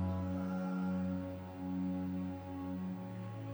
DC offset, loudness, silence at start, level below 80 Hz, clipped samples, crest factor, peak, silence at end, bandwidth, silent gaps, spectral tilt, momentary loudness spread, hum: under 0.1%; -40 LUFS; 0 s; -66 dBFS; under 0.1%; 10 dB; -28 dBFS; 0 s; over 20 kHz; none; -9 dB/octave; 7 LU; none